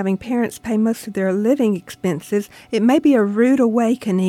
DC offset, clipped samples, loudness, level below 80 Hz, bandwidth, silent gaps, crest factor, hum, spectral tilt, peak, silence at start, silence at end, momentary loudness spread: under 0.1%; under 0.1%; -18 LUFS; -56 dBFS; 16 kHz; none; 12 dB; none; -6.5 dB/octave; -4 dBFS; 0 s; 0 s; 9 LU